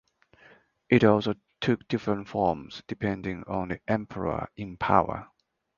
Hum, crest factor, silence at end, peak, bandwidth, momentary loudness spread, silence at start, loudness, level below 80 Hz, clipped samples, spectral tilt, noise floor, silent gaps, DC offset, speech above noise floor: none; 24 dB; 0.55 s; -4 dBFS; 7.2 kHz; 12 LU; 0.9 s; -28 LUFS; -52 dBFS; under 0.1%; -7.5 dB/octave; -58 dBFS; none; under 0.1%; 31 dB